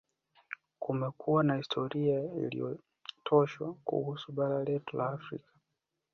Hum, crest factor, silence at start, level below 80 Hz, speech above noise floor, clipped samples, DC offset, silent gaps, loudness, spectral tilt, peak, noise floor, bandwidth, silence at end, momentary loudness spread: none; 22 dB; 0.5 s; -74 dBFS; 53 dB; under 0.1%; under 0.1%; none; -33 LUFS; -8 dB/octave; -12 dBFS; -85 dBFS; 6.6 kHz; 0.75 s; 17 LU